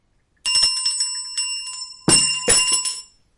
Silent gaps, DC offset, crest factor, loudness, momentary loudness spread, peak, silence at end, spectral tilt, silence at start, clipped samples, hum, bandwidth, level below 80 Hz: none; under 0.1%; 18 dB; -17 LUFS; 12 LU; -2 dBFS; 0.35 s; -0.5 dB/octave; 0.45 s; under 0.1%; none; 11.5 kHz; -48 dBFS